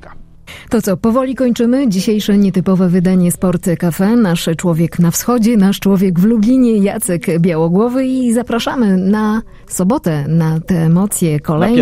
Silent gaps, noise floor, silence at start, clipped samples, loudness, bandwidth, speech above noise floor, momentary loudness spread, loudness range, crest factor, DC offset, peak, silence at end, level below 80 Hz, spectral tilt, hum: none; -35 dBFS; 0.05 s; under 0.1%; -13 LUFS; 16 kHz; 23 dB; 4 LU; 2 LU; 12 dB; under 0.1%; 0 dBFS; 0 s; -38 dBFS; -6.5 dB/octave; none